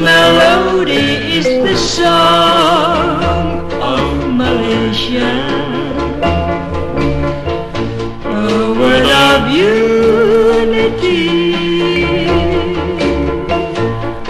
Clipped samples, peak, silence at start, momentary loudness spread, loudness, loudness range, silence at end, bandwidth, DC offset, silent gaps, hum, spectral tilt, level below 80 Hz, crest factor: under 0.1%; 0 dBFS; 0 s; 10 LU; -12 LUFS; 5 LU; 0 s; 13.5 kHz; under 0.1%; none; none; -5 dB/octave; -28 dBFS; 12 dB